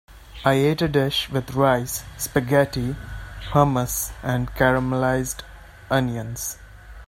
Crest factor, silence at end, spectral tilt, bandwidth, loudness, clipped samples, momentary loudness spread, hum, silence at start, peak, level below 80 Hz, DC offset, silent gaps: 20 dB; 0.05 s; -5 dB/octave; 16.5 kHz; -22 LUFS; under 0.1%; 11 LU; none; 0.1 s; -2 dBFS; -40 dBFS; under 0.1%; none